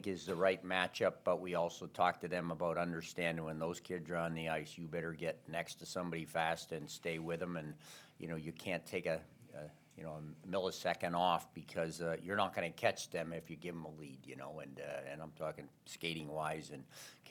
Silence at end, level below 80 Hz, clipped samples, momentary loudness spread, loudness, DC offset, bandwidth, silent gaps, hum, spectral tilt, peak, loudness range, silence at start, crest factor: 0 s; -76 dBFS; under 0.1%; 15 LU; -40 LUFS; under 0.1%; 19 kHz; none; none; -4.5 dB/octave; -16 dBFS; 7 LU; 0 s; 24 dB